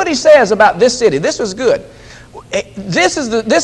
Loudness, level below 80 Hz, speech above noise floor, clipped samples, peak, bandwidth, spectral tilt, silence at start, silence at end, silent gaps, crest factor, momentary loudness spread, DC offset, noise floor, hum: -12 LUFS; -44 dBFS; 23 dB; 0.3%; 0 dBFS; 11 kHz; -3.5 dB/octave; 0 s; 0 s; none; 12 dB; 12 LU; under 0.1%; -35 dBFS; none